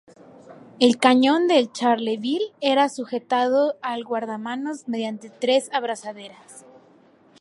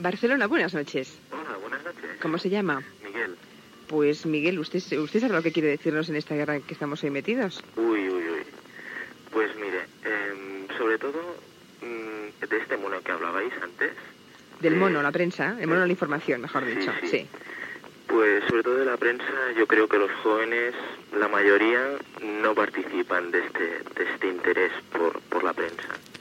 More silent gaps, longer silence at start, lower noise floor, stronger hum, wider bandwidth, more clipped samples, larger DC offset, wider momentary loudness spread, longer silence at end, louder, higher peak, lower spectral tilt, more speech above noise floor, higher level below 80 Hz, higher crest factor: neither; first, 0.5 s vs 0 s; first, -54 dBFS vs -50 dBFS; neither; second, 11.5 kHz vs 16 kHz; neither; neither; about the same, 13 LU vs 14 LU; first, 0.8 s vs 0 s; first, -22 LUFS vs -26 LUFS; first, -2 dBFS vs -8 dBFS; second, -3.5 dB/octave vs -6 dB/octave; first, 33 dB vs 24 dB; about the same, -78 dBFS vs -74 dBFS; about the same, 22 dB vs 18 dB